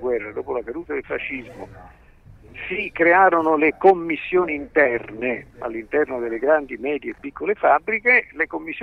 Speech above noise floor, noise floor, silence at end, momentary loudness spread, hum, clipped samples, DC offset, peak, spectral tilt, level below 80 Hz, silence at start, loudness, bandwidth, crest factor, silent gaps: 26 dB; -47 dBFS; 0 s; 14 LU; none; under 0.1%; under 0.1%; -4 dBFS; -7.5 dB/octave; -52 dBFS; 0 s; -20 LUFS; 5 kHz; 18 dB; none